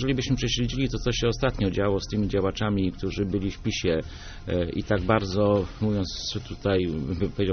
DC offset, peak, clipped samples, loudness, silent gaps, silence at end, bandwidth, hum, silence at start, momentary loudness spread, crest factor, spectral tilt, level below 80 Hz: under 0.1%; -8 dBFS; under 0.1%; -26 LUFS; none; 0 s; 6.6 kHz; none; 0 s; 6 LU; 18 dB; -5.5 dB/octave; -38 dBFS